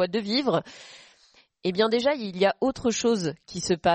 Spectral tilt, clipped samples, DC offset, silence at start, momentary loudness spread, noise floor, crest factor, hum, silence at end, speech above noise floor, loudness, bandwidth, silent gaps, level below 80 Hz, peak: -4.5 dB/octave; under 0.1%; under 0.1%; 0 s; 10 LU; -60 dBFS; 16 dB; none; 0 s; 35 dB; -25 LUFS; 8.8 kHz; none; -58 dBFS; -10 dBFS